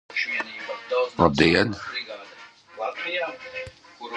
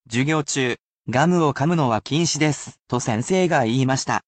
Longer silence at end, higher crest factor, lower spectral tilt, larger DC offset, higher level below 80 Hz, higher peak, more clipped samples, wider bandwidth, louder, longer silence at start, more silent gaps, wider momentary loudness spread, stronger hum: about the same, 0 s vs 0.05 s; first, 24 dB vs 16 dB; about the same, -5.5 dB/octave vs -5 dB/octave; neither; first, -48 dBFS vs -56 dBFS; first, -2 dBFS vs -6 dBFS; neither; first, 10.5 kHz vs 9 kHz; second, -24 LUFS vs -21 LUFS; about the same, 0.1 s vs 0.1 s; second, none vs 0.80-1.02 s, 2.81-2.85 s; first, 21 LU vs 7 LU; neither